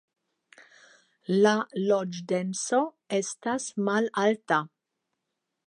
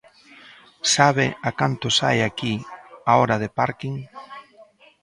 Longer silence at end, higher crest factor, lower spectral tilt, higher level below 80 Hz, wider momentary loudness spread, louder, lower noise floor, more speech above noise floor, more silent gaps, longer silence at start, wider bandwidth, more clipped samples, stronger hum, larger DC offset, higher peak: first, 1 s vs 0.4 s; about the same, 20 dB vs 22 dB; about the same, -4.5 dB/octave vs -3.5 dB/octave; second, -80 dBFS vs -56 dBFS; second, 7 LU vs 22 LU; second, -27 LUFS vs -21 LUFS; first, -83 dBFS vs -51 dBFS; first, 57 dB vs 31 dB; neither; second, 0.6 s vs 0.85 s; about the same, 11.5 kHz vs 11.5 kHz; neither; neither; neither; second, -8 dBFS vs 0 dBFS